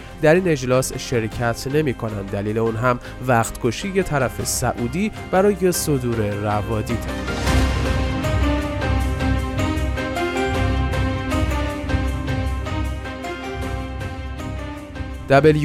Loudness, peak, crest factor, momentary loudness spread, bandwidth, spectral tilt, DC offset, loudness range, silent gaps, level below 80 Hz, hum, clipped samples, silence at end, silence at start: -21 LUFS; -2 dBFS; 18 dB; 11 LU; 16.5 kHz; -5.5 dB/octave; under 0.1%; 4 LU; none; -28 dBFS; none; under 0.1%; 0 s; 0 s